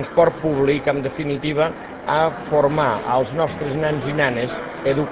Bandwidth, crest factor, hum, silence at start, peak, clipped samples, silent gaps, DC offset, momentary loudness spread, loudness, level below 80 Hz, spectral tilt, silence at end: 4 kHz; 18 dB; none; 0 s; -2 dBFS; under 0.1%; none; under 0.1%; 6 LU; -20 LUFS; -46 dBFS; -10.5 dB/octave; 0 s